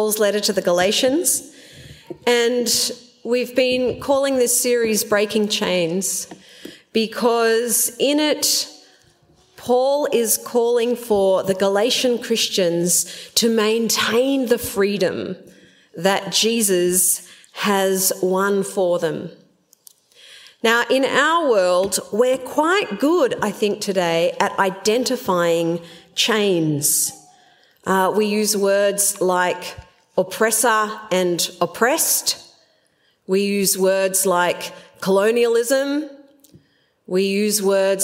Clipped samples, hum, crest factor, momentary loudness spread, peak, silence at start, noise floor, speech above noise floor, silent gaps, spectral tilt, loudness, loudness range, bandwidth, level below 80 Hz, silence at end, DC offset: under 0.1%; none; 20 dB; 7 LU; 0 dBFS; 0 s; -62 dBFS; 44 dB; none; -2.5 dB/octave; -18 LUFS; 2 LU; 16.5 kHz; -60 dBFS; 0 s; under 0.1%